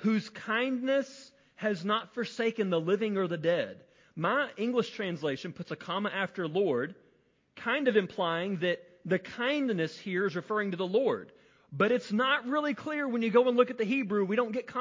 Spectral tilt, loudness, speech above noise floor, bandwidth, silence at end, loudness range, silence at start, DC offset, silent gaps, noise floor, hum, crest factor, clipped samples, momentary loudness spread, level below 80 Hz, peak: -6 dB/octave; -30 LUFS; 38 dB; 7.6 kHz; 0 s; 4 LU; 0 s; under 0.1%; none; -68 dBFS; none; 20 dB; under 0.1%; 8 LU; -76 dBFS; -10 dBFS